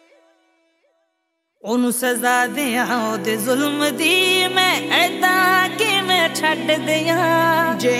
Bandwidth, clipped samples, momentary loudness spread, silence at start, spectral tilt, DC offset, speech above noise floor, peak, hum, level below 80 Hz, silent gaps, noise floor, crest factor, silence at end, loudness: 16.5 kHz; under 0.1%; 6 LU; 1.65 s; -2.5 dB/octave; under 0.1%; 55 dB; -2 dBFS; none; -70 dBFS; none; -72 dBFS; 16 dB; 0 s; -17 LUFS